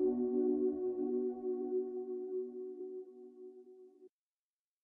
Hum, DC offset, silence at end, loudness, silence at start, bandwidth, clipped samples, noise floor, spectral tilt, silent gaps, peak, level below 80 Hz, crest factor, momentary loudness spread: none; under 0.1%; 0.75 s; -38 LUFS; 0 s; 1.6 kHz; under 0.1%; under -90 dBFS; -11 dB/octave; none; -24 dBFS; -78 dBFS; 14 dB; 21 LU